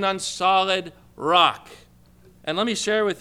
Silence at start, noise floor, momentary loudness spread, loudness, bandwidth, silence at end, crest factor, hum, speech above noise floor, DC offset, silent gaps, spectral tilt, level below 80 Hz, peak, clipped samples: 0 s; -52 dBFS; 16 LU; -21 LUFS; 15.5 kHz; 0 s; 20 dB; 60 Hz at -55 dBFS; 31 dB; under 0.1%; none; -2.5 dB/octave; -60 dBFS; -4 dBFS; under 0.1%